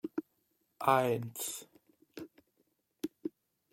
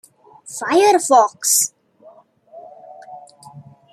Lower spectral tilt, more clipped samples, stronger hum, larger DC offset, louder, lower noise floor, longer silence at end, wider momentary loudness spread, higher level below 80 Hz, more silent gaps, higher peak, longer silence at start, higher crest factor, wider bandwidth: first, -4.5 dB/octave vs -1.5 dB/octave; neither; neither; neither; second, -35 LUFS vs -15 LUFS; first, -78 dBFS vs -48 dBFS; first, 0.45 s vs 0.3 s; about the same, 21 LU vs 22 LU; about the same, -80 dBFS vs -76 dBFS; neither; second, -12 dBFS vs -2 dBFS; second, 0.05 s vs 0.45 s; first, 26 dB vs 18 dB; about the same, 16.5 kHz vs 15.5 kHz